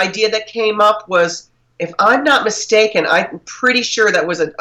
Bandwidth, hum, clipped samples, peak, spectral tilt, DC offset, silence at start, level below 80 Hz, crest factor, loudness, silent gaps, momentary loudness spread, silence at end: 12.5 kHz; none; under 0.1%; -2 dBFS; -2.5 dB/octave; under 0.1%; 0 s; -60 dBFS; 12 dB; -14 LUFS; none; 7 LU; 0.1 s